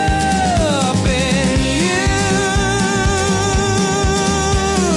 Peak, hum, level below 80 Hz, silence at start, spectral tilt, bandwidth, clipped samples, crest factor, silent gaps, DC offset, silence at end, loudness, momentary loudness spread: -4 dBFS; none; -26 dBFS; 0 s; -4.5 dB/octave; 11.5 kHz; under 0.1%; 10 dB; none; under 0.1%; 0 s; -15 LUFS; 1 LU